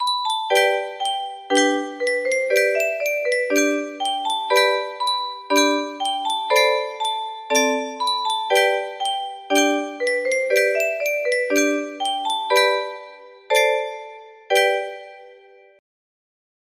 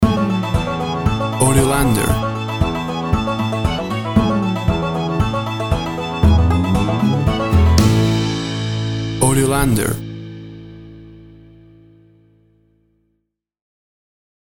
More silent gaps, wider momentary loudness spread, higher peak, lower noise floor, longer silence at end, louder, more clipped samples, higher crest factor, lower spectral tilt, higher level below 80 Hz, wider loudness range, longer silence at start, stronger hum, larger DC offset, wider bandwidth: neither; about the same, 7 LU vs 8 LU; second, -4 dBFS vs 0 dBFS; second, -48 dBFS vs -72 dBFS; second, 1.4 s vs 3.3 s; second, -20 LUFS vs -17 LUFS; neither; about the same, 18 dB vs 18 dB; second, 0 dB/octave vs -5.5 dB/octave; second, -74 dBFS vs -28 dBFS; second, 1 LU vs 5 LU; about the same, 0 s vs 0 s; neither; neither; second, 15.5 kHz vs 18 kHz